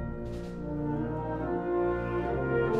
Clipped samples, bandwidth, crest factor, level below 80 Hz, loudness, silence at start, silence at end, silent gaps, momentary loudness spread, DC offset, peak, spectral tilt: under 0.1%; 7.4 kHz; 14 dB; -44 dBFS; -32 LUFS; 0 s; 0 s; none; 8 LU; under 0.1%; -16 dBFS; -9.5 dB/octave